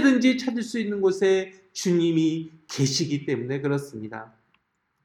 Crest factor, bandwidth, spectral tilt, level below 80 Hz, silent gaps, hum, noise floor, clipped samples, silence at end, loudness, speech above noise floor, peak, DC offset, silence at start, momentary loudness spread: 18 dB; 13.5 kHz; -5 dB/octave; -72 dBFS; none; none; -70 dBFS; under 0.1%; 0.8 s; -25 LUFS; 46 dB; -8 dBFS; under 0.1%; 0 s; 14 LU